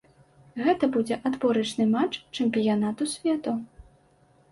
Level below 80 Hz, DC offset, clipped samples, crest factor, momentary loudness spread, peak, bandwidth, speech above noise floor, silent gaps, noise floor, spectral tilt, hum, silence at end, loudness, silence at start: -62 dBFS; under 0.1%; under 0.1%; 16 dB; 7 LU; -12 dBFS; 11.5 kHz; 36 dB; none; -61 dBFS; -5 dB/octave; none; 0.7 s; -26 LUFS; 0.55 s